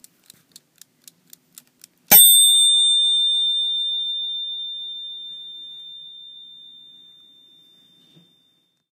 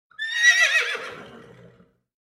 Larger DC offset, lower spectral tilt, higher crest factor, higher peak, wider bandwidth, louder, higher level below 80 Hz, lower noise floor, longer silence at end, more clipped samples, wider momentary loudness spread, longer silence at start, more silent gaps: neither; about the same, 2 dB/octave vs 1.5 dB/octave; about the same, 22 dB vs 20 dB; first, 0 dBFS vs -4 dBFS; about the same, 15.5 kHz vs 16 kHz; first, -14 LUFS vs -18 LUFS; first, -64 dBFS vs -72 dBFS; first, -65 dBFS vs -56 dBFS; first, 2.5 s vs 0.9 s; neither; first, 27 LU vs 16 LU; first, 2.1 s vs 0.2 s; neither